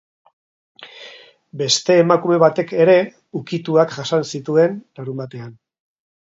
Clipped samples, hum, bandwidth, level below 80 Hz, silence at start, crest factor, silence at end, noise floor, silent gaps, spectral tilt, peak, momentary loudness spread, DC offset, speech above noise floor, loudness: under 0.1%; none; 7.8 kHz; -68 dBFS; 0.8 s; 18 dB; 0.75 s; -43 dBFS; none; -4.5 dB/octave; 0 dBFS; 23 LU; under 0.1%; 26 dB; -17 LUFS